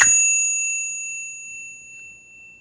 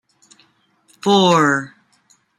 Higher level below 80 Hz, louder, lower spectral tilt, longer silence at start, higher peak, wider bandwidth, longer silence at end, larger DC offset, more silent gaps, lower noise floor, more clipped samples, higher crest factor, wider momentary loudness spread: about the same, -60 dBFS vs -64 dBFS; second, -18 LUFS vs -15 LUFS; second, 2.5 dB/octave vs -4.5 dB/octave; second, 0 s vs 1.05 s; about the same, 0 dBFS vs -2 dBFS; second, 10.5 kHz vs 13 kHz; second, 0.05 s vs 0.7 s; neither; neither; second, -45 dBFS vs -58 dBFS; neither; about the same, 22 dB vs 18 dB; first, 24 LU vs 13 LU